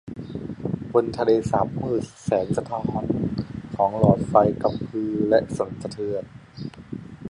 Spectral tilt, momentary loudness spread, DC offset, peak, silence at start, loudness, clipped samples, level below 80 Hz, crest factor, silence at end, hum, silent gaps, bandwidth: -8 dB/octave; 16 LU; under 0.1%; -2 dBFS; 0.05 s; -24 LUFS; under 0.1%; -48 dBFS; 22 dB; 0 s; none; none; 11 kHz